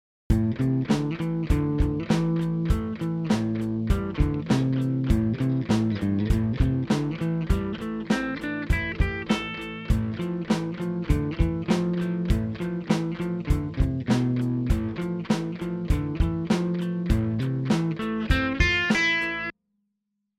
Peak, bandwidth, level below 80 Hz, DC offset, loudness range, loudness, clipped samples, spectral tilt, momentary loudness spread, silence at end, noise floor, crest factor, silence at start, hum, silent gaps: -8 dBFS; 14.5 kHz; -32 dBFS; under 0.1%; 3 LU; -26 LUFS; under 0.1%; -7 dB/octave; 6 LU; 0.9 s; -79 dBFS; 18 dB; 0.3 s; none; none